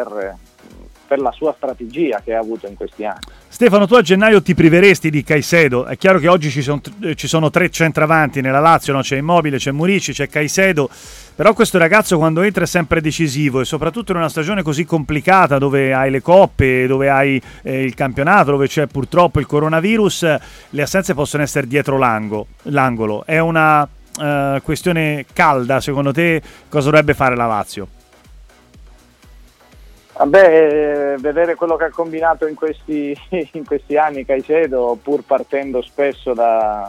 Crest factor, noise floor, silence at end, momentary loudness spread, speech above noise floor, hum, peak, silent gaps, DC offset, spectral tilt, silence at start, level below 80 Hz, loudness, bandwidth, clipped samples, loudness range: 14 dB; -44 dBFS; 0 s; 12 LU; 29 dB; none; 0 dBFS; none; under 0.1%; -5.5 dB/octave; 0 s; -42 dBFS; -15 LUFS; 16.5 kHz; under 0.1%; 6 LU